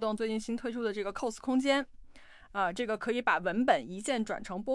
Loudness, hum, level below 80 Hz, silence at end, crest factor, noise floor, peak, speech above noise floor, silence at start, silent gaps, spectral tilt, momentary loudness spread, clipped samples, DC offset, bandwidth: -32 LUFS; none; -60 dBFS; 0 s; 20 dB; -52 dBFS; -12 dBFS; 21 dB; 0 s; none; -4 dB/octave; 8 LU; under 0.1%; under 0.1%; 12 kHz